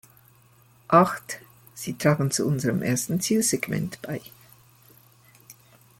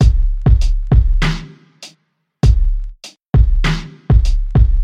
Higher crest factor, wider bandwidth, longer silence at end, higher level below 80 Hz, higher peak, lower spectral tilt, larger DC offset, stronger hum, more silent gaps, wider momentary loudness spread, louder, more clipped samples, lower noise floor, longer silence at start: first, 22 dB vs 12 dB; first, 17 kHz vs 8.6 kHz; first, 0.45 s vs 0 s; second, -62 dBFS vs -14 dBFS; second, -4 dBFS vs 0 dBFS; second, -5 dB/octave vs -6.5 dB/octave; neither; neither; second, none vs 3.27-3.33 s; second, 17 LU vs 21 LU; second, -24 LUFS vs -16 LUFS; neither; second, -57 dBFS vs -63 dBFS; first, 0.9 s vs 0 s